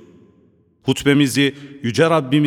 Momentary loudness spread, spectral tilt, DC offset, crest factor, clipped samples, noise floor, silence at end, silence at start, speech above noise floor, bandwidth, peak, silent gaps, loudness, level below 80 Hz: 10 LU; -5.5 dB/octave; under 0.1%; 16 dB; under 0.1%; -55 dBFS; 0 s; 0.85 s; 39 dB; 15.5 kHz; -2 dBFS; none; -18 LUFS; -52 dBFS